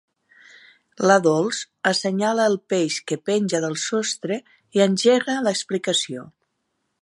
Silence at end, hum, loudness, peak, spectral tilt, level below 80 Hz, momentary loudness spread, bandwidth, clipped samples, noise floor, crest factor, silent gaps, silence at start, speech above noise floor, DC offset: 0.75 s; none; -21 LUFS; -2 dBFS; -4 dB/octave; -74 dBFS; 9 LU; 11.5 kHz; under 0.1%; -74 dBFS; 20 dB; none; 1 s; 53 dB; under 0.1%